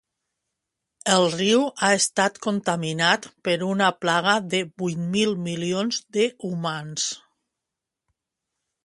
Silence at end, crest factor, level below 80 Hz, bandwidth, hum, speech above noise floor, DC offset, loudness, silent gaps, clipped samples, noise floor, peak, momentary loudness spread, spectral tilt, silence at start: 1.65 s; 22 dB; -68 dBFS; 11.5 kHz; none; 63 dB; under 0.1%; -23 LUFS; none; under 0.1%; -86 dBFS; -4 dBFS; 8 LU; -3.5 dB/octave; 1.05 s